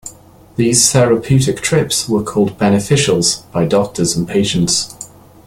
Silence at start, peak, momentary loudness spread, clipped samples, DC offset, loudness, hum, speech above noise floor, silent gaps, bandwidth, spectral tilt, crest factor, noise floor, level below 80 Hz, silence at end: 0.05 s; 0 dBFS; 8 LU; under 0.1%; under 0.1%; -14 LUFS; none; 26 dB; none; 16.5 kHz; -4 dB/octave; 14 dB; -40 dBFS; -44 dBFS; 0.4 s